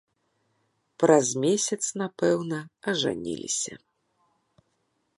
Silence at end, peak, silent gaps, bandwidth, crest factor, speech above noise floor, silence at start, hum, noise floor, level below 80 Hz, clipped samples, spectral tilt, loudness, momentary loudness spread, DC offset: 1.4 s; -6 dBFS; none; 11.5 kHz; 22 dB; 48 dB; 1 s; none; -74 dBFS; -70 dBFS; under 0.1%; -3.5 dB/octave; -26 LUFS; 12 LU; under 0.1%